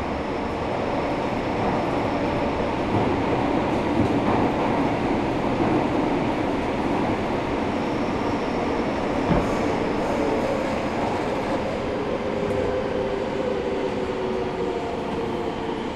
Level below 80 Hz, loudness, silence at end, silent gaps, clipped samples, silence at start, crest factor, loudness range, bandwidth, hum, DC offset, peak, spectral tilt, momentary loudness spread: -40 dBFS; -24 LUFS; 0 s; none; under 0.1%; 0 s; 16 dB; 3 LU; 12.5 kHz; none; under 0.1%; -8 dBFS; -6.5 dB/octave; 4 LU